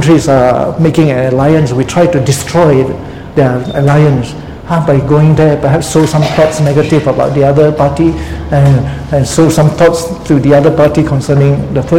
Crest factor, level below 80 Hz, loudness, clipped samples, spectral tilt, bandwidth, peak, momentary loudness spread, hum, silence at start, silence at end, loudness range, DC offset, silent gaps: 8 dB; -28 dBFS; -9 LUFS; 1%; -7 dB/octave; 15.5 kHz; 0 dBFS; 6 LU; none; 0 s; 0 s; 1 LU; 0.9%; none